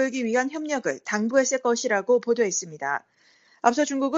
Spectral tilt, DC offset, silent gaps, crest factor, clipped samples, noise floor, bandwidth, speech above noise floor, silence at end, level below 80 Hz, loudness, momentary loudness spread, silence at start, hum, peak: -3 dB/octave; under 0.1%; none; 20 dB; under 0.1%; -59 dBFS; 8 kHz; 35 dB; 0 s; -72 dBFS; -24 LUFS; 7 LU; 0 s; none; -4 dBFS